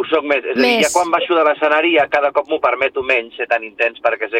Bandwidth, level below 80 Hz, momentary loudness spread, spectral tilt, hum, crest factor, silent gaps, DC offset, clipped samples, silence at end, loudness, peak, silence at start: 16.5 kHz; -58 dBFS; 6 LU; -2 dB/octave; none; 14 dB; none; under 0.1%; under 0.1%; 0 s; -16 LUFS; -2 dBFS; 0 s